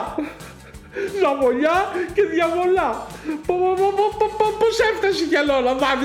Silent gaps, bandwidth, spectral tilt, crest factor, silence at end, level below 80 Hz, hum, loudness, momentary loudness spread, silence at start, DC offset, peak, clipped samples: none; 15.5 kHz; -4.5 dB/octave; 14 dB; 0 s; -46 dBFS; none; -20 LUFS; 11 LU; 0 s; under 0.1%; -6 dBFS; under 0.1%